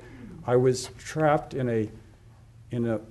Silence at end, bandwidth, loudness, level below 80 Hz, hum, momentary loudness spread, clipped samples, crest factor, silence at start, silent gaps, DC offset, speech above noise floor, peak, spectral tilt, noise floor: 0 s; 12 kHz; -27 LUFS; -54 dBFS; none; 13 LU; under 0.1%; 20 dB; 0 s; none; under 0.1%; 26 dB; -8 dBFS; -6.5 dB/octave; -52 dBFS